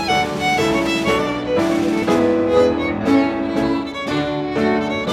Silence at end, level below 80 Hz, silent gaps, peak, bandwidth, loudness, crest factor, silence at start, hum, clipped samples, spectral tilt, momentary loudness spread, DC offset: 0 s; -42 dBFS; none; -2 dBFS; 15 kHz; -18 LUFS; 14 dB; 0 s; none; under 0.1%; -5.5 dB/octave; 5 LU; under 0.1%